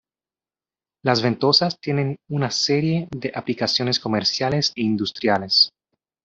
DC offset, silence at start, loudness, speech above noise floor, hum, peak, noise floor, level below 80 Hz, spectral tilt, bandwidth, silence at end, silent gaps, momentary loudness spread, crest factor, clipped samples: under 0.1%; 1.05 s; -20 LUFS; over 69 dB; none; -2 dBFS; under -90 dBFS; -60 dBFS; -4.5 dB/octave; 7.8 kHz; 0.55 s; none; 9 LU; 20 dB; under 0.1%